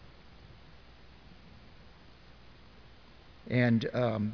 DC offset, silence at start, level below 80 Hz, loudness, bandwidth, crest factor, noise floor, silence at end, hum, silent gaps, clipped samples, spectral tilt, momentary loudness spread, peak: 0.1%; 0.3 s; -60 dBFS; -29 LUFS; 5.4 kHz; 22 dB; -56 dBFS; 0 s; none; none; under 0.1%; -8.5 dB/octave; 28 LU; -14 dBFS